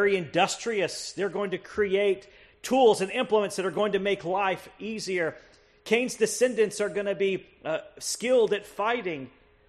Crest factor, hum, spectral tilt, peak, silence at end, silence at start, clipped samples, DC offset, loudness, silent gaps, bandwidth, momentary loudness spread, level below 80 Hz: 18 dB; none; -3.5 dB/octave; -8 dBFS; 0.4 s; 0 s; under 0.1%; under 0.1%; -27 LUFS; none; 13 kHz; 10 LU; -64 dBFS